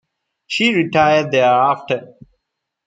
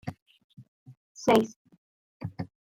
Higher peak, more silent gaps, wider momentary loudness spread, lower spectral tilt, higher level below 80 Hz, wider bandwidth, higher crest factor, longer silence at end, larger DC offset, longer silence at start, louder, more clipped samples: first, -2 dBFS vs -6 dBFS; second, none vs 0.22-0.26 s, 0.44-0.50 s, 0.68-0.86 s, 0.97-1.15 s, 1.56-1.65 s, 1.78-2.20 s; second, 10 LU vs 19 LU; about the same, -5 dB/octave vs -5.5 dB/octave; first, -56 dBFS vs -66 dBFS; second, 9.2 kHz vs 16.5 kHz; second, 16 dB vs 26 dB; first, 0.8 s vs 0.25 s; neither; first, 0.5 s vs 0.05 s; first, -15 LUFS vs -27 LUFS; neither